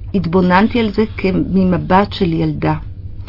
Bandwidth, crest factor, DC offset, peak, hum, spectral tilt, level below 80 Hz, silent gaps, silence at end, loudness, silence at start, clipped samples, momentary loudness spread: 5.8 kHz; 14 dB; under 0.1%; 0 dBFS; none; -9 dB/octave; -32 dBFS; none; 0.05 s; -15 LUFS; 0 s; under 0.1%; 7 LU